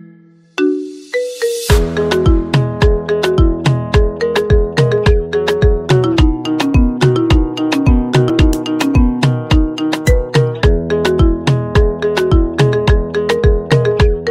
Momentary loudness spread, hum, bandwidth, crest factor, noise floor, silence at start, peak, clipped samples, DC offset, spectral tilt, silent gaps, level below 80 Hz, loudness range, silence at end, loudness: 4 LU; none; 15 kHz; 12 dB; -43 dBFS; 0.6 s; 0 dBFS; under 0.1%; under 0.1%; -6.5 dB/octave; none; -18 dBFS; 1 LU; 0 s; -14 LUFS